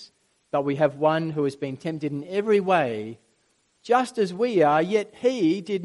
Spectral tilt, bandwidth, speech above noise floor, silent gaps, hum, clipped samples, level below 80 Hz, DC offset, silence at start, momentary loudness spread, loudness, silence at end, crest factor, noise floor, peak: -6.5 dB/octave; 11.5 kHz; 44 dB; none; none; under 0.1%; -72 dBFS; under 0.1%; 0 s; 10 LU; -24 LUFS; 0 s; 18 dB; -68 dBFS; -8 dBFS